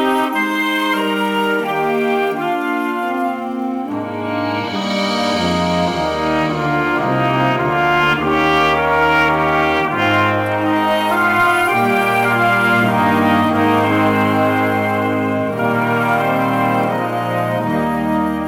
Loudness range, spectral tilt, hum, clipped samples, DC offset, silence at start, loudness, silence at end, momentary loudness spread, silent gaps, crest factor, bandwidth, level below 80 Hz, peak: 5 LU; -6 dB/octave; none; under 0.1%; under 0.1%; 0 s; -16 LUFS; 0 s; 6 LU; none; 12 dB; 19.5 kHz; -46 dBFS; -4 dBFS